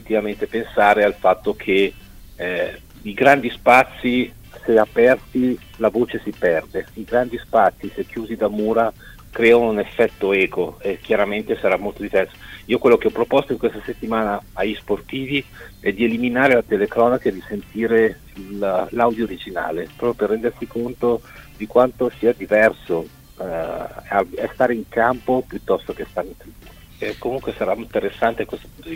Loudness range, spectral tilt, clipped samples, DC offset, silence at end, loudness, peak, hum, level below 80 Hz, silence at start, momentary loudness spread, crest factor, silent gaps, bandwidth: 5 LU; -6 dB/octave; under 0.1%; under 0.1%; 0 s; -20 LUFS; 0 dBFS; none; -46 dBFS; 0 s; 13 LU; 20 dB; none; 16 kHz